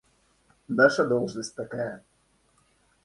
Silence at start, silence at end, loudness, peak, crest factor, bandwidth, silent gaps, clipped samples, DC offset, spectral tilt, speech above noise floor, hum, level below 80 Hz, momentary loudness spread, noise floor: 0.7 s; 1.05 s; -26 LUFS; -6 dBFS; 22 dB; 11.5 kHz; none; under 0.1%; under 0.1%; -5 dB/octave; 42 dB; none; -66 dBFS; 14 LU; -67 dBFS